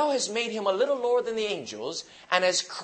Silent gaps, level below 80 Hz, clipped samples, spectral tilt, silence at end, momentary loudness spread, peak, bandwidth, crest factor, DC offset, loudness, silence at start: none; -74 dBFS; under 0.1%; -2 dB/octave; 0 s; 10 LU; -6 dBFS; 8.8 kHz; 22 dB; under 0.1%; -27 LUFS; 0 s